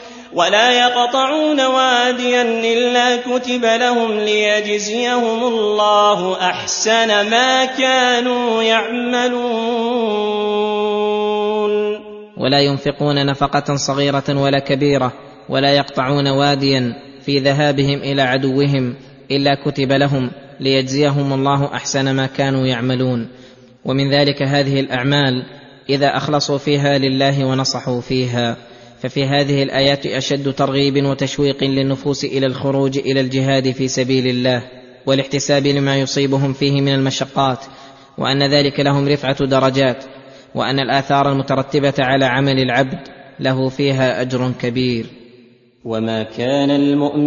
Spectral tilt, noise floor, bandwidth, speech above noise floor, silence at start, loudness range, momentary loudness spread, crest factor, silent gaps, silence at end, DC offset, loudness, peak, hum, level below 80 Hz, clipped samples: -5 dB/octave; -47 dBFS; 7.4 kHz; 32 dB; 0 s; 3 LU; 7 LU; 16 dB; none; 0 s; under 0.1%; -16 LUFS; 0 dBFS; none; -50 dBFS; under 0.1%